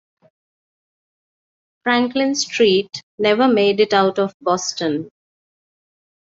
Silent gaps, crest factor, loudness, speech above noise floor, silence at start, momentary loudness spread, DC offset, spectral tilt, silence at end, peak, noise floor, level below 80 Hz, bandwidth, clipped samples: 3.03-3.18 s, 4.34-4.40 s; 18 dB; -18 LUFS; over 73 dB; 1.85 s; 10 LU; under 0.1%; -3.5 dB/octave; 1.25 s; -2 dBFS; under -90 dBFS; -66 dBFS; 7.8 kHz; under 0.1%